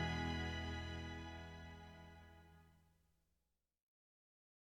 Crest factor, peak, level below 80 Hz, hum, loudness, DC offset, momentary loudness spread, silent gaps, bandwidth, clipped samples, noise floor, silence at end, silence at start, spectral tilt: 20 dB; -30 dBFS; -62 dBFS; none; -47 LUFS; under 0.1%; 21 LU; none; 10.5 kHz; under 0.1%; -88 dBFS; 1.95 s; 0 s; -5.5 dB/octave